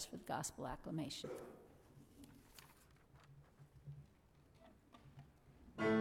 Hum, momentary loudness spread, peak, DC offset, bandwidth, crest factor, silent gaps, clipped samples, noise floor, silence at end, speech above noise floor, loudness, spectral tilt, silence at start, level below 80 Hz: none; 22 LU; -26 dBFS; under 0.1%; 17.5 kHz; 22 dB; none; under 0.1%; -69 dBFS; 0 s; 22 dB; -47 LUFS; -4.5 dB/octave; 0 s; -70 dBFS